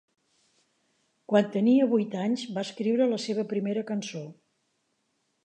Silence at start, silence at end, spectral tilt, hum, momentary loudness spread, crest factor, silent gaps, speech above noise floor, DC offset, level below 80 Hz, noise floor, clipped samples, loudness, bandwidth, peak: 1.3 s; 1.15 s; -6 dB/octave; none; 11 LU; 20 dB; none; 49 dB; under 0.1%; -82 dBFS; -75 dBFS; under 0.1%; -27 LUFS; 9.4 kHz; -8 dBFS